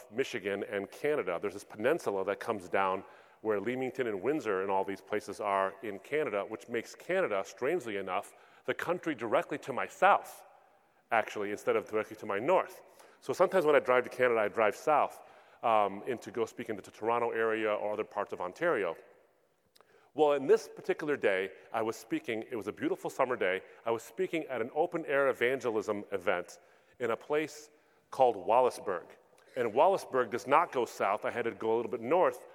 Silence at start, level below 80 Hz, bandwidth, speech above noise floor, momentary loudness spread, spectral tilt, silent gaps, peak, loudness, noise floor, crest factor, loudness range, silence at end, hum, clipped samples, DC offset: 0 s; -82 dBFS; 16.5 kHz; 40 dB; 10 LU; -5 dB/octave; none; -10 dBFS; -32 LUFS; -71 dBFS; 22 dB; 4 LU; 0 s; none; under 0.1%; under 0.1%